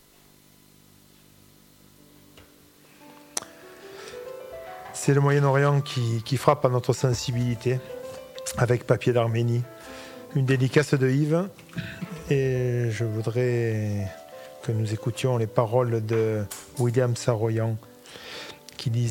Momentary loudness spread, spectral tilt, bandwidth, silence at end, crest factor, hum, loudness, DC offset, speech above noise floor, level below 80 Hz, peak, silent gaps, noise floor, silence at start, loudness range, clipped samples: 18 LU; -6.5 dB/octave; 17 kHz; 0 s; 24 dB; none; -25 LUFS; under 0.1%; 32 dB; -58 dBFS; -2 dBFS; none; -56 dBFS; 3 s; 16 LU; under 0.1%